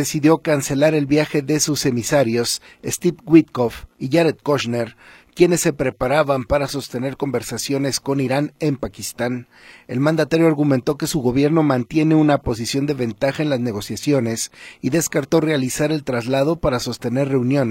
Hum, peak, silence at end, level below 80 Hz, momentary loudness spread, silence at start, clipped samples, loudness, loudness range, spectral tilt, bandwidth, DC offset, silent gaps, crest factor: none; 0 dBFS; 0 s; -46 dBFS; 9 LU; 0 s; under 0.1%; -19 LUFS; 3 LU; -5 dB/octave; 16.5 kHz; under 0.1%; none; 18 dB